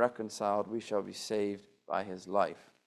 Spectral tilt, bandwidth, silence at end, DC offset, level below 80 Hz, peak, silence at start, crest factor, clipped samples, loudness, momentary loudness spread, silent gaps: -4.5 dB/octave; 13.5 kHz; 0.25 s; under 0.1%; -76 dBFS; -14 dBFS; 0 s; 22 dB; under 0.1%; -35 LUFS; 5 LU; none